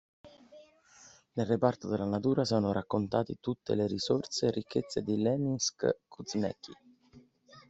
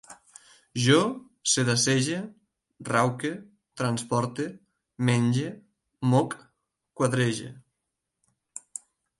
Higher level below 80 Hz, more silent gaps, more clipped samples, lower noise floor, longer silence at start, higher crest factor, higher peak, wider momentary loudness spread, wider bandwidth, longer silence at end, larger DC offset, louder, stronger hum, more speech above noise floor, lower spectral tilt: about the same, -68 dBFS vs -68 dBFS; neither; neither; second, -60 dBFS vs -83 dBFS; first, 0.25 s vs 0.1 s; about the same, 22 dB vs 20 dB; about the same, -10 dBFS vs -8 dBFS; second, 8 LU vs 19 LU; second, 8.2 kHz vs 11.5 kHz; second, 0.1 s vs 1.6 s; neither; second, -32 LUFS vs -26 LUFS; neither; second, 29 dB vs 58 dB; about the same, -5.5 dB/octave vs -4.5 dB/octave